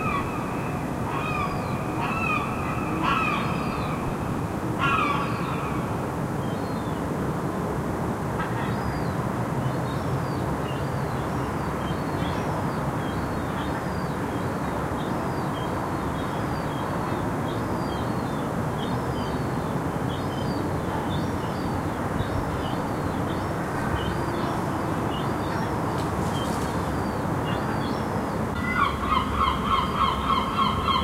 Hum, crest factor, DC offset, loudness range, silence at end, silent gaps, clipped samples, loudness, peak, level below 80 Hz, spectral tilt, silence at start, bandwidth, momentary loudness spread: none; 16 dB; under 0.1%; 3 LU; 0 s; none; under 0.1%; -27 LUFS; -10 dBFS; -40 dBFS; -6 dB/octave; 0 s; 16 kHz; 5 LU